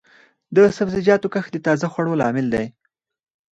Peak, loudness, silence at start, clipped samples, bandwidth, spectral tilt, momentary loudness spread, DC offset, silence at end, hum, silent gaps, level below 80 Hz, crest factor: -2 dBFS; -19 LUFS; 0.5 s; under 0.1%; 8 kHz; -7 dB/octave; 8 LU; under 0.1%; 0.8 s; none; none; -54 dBFS; 18 dB